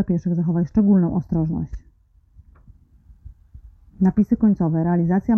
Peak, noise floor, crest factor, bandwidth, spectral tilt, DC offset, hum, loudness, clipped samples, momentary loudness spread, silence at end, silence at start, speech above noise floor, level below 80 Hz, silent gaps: -6 dBFS; -55 dBFS; 14 dB; 2.2 kHz; -12 dB/octave; under 0.1%; none; -20 LUFS; under 0.1%; 8 LU; 0 s; 0 s; 36 dB; -42 dBFS; none